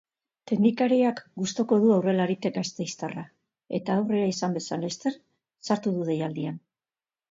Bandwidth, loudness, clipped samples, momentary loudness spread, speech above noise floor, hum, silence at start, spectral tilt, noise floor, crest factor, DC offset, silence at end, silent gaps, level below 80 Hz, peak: 7.8 kHz; -26 LUFS; under 0.1%; 13 LU; over 64 dB; none; 0.45 s; -6 dB/octave; under -90 dBFS; 18 dB; under 0.1%; 0.7 s; none; -72 dBFS; -10 dBFS